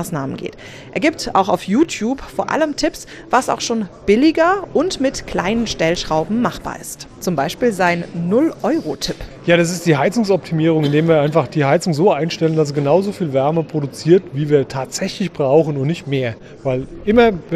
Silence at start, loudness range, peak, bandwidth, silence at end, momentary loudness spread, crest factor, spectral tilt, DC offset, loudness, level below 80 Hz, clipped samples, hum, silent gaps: 0 s; 3 LU; -2 dBFS; 14.5 kHz; 0 s; 9 LU; 16 dB; -5.5 dB/octave; under 0.1%; -17 LUFS; -44 dBFS; under 0.1%; none; none